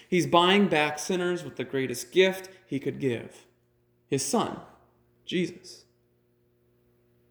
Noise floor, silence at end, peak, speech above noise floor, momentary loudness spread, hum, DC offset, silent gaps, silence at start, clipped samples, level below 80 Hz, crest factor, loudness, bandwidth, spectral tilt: -68 dBFS; 1.55 s; -6 dBFS; 41 dB; 19 LU; 60 Hz at -60 dBFS; under 0.1%; none; 0.1 s; under 0.1%; -70 dBFS; 22 dB; -27 LUFS; over 20 kHz; -4.5 dB/octave